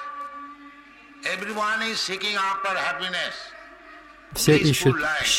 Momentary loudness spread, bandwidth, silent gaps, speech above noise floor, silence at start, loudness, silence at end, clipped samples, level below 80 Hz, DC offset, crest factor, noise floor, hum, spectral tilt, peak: 23 LU; 16.5 kHz; none; 25 dB; 0 s; -23 LUFS; 0 s; under 0.1%; -52 dBFS; under 0.1%; 20 dB; -48 dBFS; none; -3.5 dB/octave; -6 dBFS